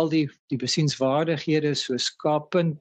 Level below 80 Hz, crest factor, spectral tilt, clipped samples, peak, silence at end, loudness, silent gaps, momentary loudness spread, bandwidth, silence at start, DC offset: -68 dBFS; 14 dB; -5 dB/octave; under 0.1%; -10 dBFS; 0.05 s; -24 LUFS; 0.39-0.48 s; 3 LU; 9 kHz; 0 s; under 0.1%